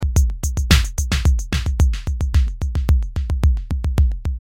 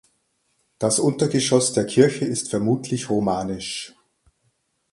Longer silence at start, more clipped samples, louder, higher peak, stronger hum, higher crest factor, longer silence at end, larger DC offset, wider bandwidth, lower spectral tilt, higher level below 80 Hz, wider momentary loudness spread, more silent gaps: second, 0 s vs 0.8 s; neither; about the same, -20 LUFS vs -21 LUFS; about the same, 0 dBFS vs -2 dBFS; neither; about the same, 16 dB vs 20 dB; second, 0.05 s vs 1.05 s; neither; first, 16.5 kHz vs 11.5 kHz; about the same, -5 dB/octave vs -4.5 dB/octave; first, -18 dBFS vs -56 dBFS; second, 6 LU vs 10 LU; neither